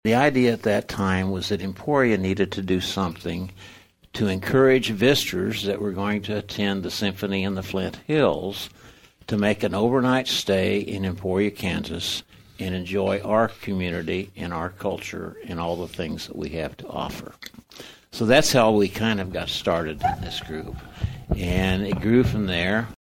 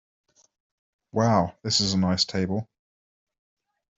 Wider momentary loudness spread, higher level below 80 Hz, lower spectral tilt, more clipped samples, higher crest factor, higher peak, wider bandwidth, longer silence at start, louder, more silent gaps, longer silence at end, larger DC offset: first, 13 LU vs 8 LU; first, -44 dBFS vs -60 dBFS; about the same, -5 dB/octave vs -4.5 dB/octave; neither; about the same, 20 dB vs 20 dB; about the same, -4 dBFS vs -6 dBFS; first, 16.5 kHz vs 8.2 kHz; second, 0.05 s vs 1.15 s; about the same, -24 LUFS vs -24 LUFS; neither; second, 0.1 s vs 1.35 s; neither